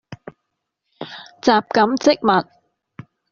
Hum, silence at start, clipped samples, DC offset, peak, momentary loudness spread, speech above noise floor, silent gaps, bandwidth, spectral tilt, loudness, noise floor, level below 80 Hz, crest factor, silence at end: none; 0.1 s; under 0.1%; under 0.1%; -2 dBFS; 22 LU; 61 dB; none; 7.4 kHz; -3 dB/octave; -17 LUFS; -77 dBFS; -60 dBFS; 18 dB; 0.9 s